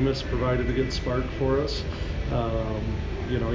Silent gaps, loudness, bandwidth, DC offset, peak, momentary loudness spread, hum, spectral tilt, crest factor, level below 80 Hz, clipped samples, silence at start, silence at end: none; -27 LUFS; 7.6 kHz; under 0.1%; -14 dBFS; 6 LU; none; -7 dB/octave; 12 dB; -32 dBFS; under 0.1%; 0 s; 0 s